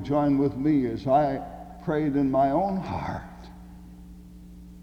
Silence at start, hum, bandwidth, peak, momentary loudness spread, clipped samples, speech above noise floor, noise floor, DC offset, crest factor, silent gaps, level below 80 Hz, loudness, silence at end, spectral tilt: 0 s; none; 6.8 kHz; -10 dBFS; 23 LU; under 0.1%; 21 dB; -45 dBFS; under 0.1%; 16 dB; none; -48 dBFS; -25 LUFS; 0 s; -9 dB/octave